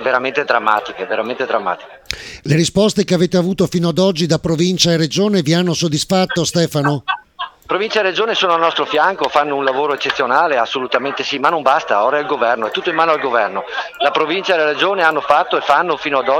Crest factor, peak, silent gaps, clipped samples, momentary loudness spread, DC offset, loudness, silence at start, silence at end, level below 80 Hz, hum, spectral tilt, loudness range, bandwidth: 16 dB; 0 dBFS; none; under 0.1%; 7 LU; under 0.1%; -16 LUFS; 0 s; 0 s; -50 dBFS; none; -4.5 dB/octave; 2 LU; 18 kHz